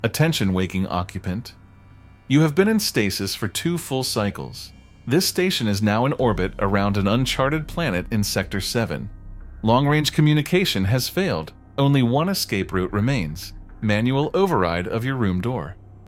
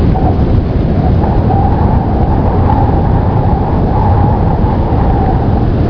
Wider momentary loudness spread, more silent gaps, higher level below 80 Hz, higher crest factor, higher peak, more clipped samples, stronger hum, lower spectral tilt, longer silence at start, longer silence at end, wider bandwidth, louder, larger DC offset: first, 12 LU vs 2 LU; neither; second, -42 dBFS vs -14 dBFS; first, 18 dB vs 8 dB; second, -4 dBFS vs 0 dBFS; neither; neither; second, -5.5 dB/octave vs -11 dB/octave; about the same, 0 s vs 0 s; about the same, 0 s vs 0 s; first, 16.5 kHz vs 5.4 kHz; second, -22 LUFS vs -11 LUFS; neither